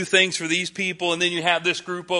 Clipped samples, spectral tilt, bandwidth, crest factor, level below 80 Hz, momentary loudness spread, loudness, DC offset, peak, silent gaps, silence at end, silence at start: under 0.1%; -2.5 dB/octave; 11.5 kHz; 20 dB; -68 dBFS; 6 LU; -21 LUFS; under 0.1%; -4 dBFS; none; 0 s; 0 s